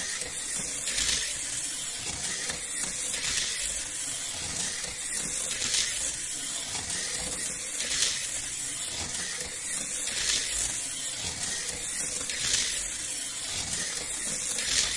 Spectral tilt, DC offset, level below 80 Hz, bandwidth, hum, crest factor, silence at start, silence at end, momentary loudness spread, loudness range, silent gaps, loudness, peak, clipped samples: 0.5 dB/octave; under 0.1%; -52 dBFS; 11.5 kHz; none; 24 dB; 0 s; 0 s; 5 LU; 1 LU; none; -29 LUFS; -8 dBFS; under 0.1%